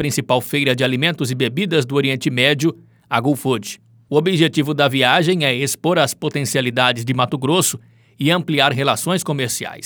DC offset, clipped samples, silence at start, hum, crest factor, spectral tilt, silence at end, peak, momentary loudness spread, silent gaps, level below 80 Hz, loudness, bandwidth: under 0.1%; under 0.1%; 0 s; none; 18 dB; -4 dB/octave; 0 s; 0 dBFS; 7 LU; none; -62 dBFS; -17 LUFS; over 20 kHz